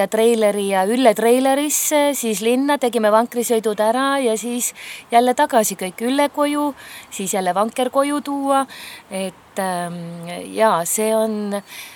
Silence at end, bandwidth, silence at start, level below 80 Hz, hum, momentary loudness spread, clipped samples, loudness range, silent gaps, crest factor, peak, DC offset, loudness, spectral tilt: 0 s; 19.5 kHz; 0 s; -68 dBFS; none; 12 LU; under 0.1%; 5 LU; none; 18 dB; 0 dBFS; under 0.1%; -18 LUFS; -3.5 dB/octave